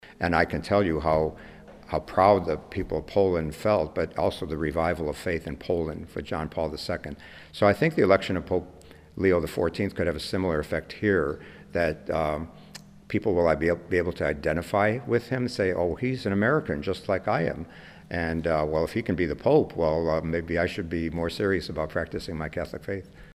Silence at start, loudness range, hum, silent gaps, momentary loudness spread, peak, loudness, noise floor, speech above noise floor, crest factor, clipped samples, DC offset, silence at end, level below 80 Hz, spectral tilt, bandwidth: 0.05 s; 3 LU; none; none; 11 LU; -6 dBFS; -27 LUFS; -47 dBFS; 21 dB; 20 dB; under 0.1%; under 0.1%; 0 s; -46 dBFS; -7 dB/octave; 15.5 kHz